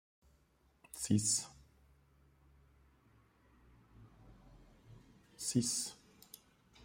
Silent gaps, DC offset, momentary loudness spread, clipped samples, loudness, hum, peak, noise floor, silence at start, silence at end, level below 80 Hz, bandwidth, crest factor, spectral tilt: none; under 0.1%; 25 LU; under 0.1%; -36 LUFS; none; -20 dBFS; -72 dBFS; 0.95 s; 0 s; -68 dBFS; 16 kHz; 24 dB; -3.5 dB/octave